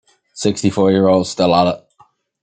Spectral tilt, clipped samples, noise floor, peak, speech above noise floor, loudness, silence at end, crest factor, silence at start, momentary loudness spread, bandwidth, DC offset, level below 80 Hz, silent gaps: -5.5 dB/octave; under 0.1%; -53 dBFS; -2 dBFS; 39 dB; -15 LUFS; 0.65 s; 16 dB; 0.35 s; 7 LU; 9.4 kHz; under 0.1%; -54 dBFS; none